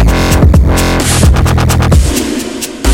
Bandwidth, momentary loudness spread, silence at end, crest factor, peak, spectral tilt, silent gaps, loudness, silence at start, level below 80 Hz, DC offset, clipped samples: 17 kHz; 8 LU; 0 s; 8 dB; 0 dBFS; -5 dB/octave; none; -9 LUFS; 0 s; -12 dBFS; under 0.1%; under 0.1%